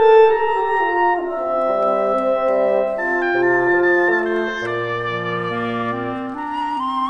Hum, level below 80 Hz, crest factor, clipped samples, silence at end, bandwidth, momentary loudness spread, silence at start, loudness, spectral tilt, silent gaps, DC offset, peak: 50 Hz at -60 dBFS; -52 dBFS; 16 dB; under 0.1%; 0 s; 7.6 kHz; 8 LU; 0 s; -18 LUFS; -6.5 dB/octave; none; under 0.1%; -2 dBFS